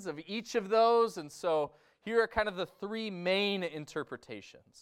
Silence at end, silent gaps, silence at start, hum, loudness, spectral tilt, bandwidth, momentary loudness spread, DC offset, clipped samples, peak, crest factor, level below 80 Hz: 0.25 s; none; 0 s; none; -32 LUFS; -4.5 dB/octave; 14 kHz; 15 LU; under 0.1%; under 0.1%; -14 dBFS; 18 dB; -64 dBFS